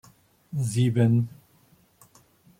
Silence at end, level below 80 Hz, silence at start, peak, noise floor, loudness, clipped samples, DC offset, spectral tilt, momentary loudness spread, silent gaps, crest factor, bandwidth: 1.3 s; -64 dBFS; 0.5 s; -10 dBFS; -61 dBFS; -25 LUFS; under 0.1%; under 0.1%; -7 dB/octave; 13 LU; none; 18 dB; 14.5 kHz